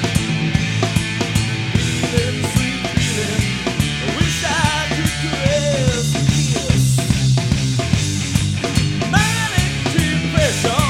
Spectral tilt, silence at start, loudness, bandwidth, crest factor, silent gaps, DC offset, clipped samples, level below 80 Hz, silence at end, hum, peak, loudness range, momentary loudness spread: -4.5 dB/octave; 0 s; -18 LUFS; 16 kHz; 16 dB; none; under 0.1%; under 0.1%; -30 dBFS; 0 s; none; 0 dBFS; 2 LU; 3 LU